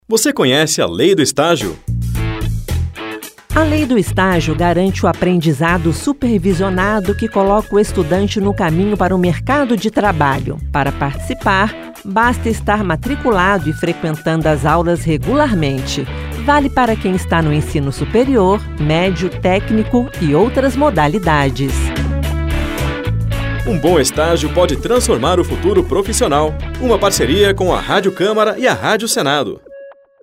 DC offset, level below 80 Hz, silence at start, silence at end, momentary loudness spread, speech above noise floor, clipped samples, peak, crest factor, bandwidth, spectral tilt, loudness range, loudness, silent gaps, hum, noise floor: under 0.1%; -26 dBFS; 0.1 s; 0.3 s; 7 LU; 23 dB; under 0.1%; 0 dBFS; 14 dB; 16 kHz; -5 dB/octave; 2 LU; -15 LUFS; none; none; -37 dBFS